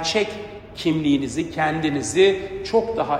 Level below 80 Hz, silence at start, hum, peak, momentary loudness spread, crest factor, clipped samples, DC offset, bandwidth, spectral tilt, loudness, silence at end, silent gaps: -48 dBFS; 0 s; none; -4 dBFS; 10 LU; 16 dB; under 0.1%; under 0.1%; 12 kHz; -4.5 dB/octave; -21 LUFS; 0 s; none